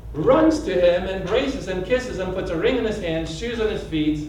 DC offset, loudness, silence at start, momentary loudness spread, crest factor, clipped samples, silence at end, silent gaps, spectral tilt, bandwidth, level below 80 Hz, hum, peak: under 0.1%; -22 LUFS; 0 s; 9 LU; 16 dB; under 0.1%; 0 s; none; -6 dB/octave; 11 kHz; -38 dBFS; none; -6 dBFS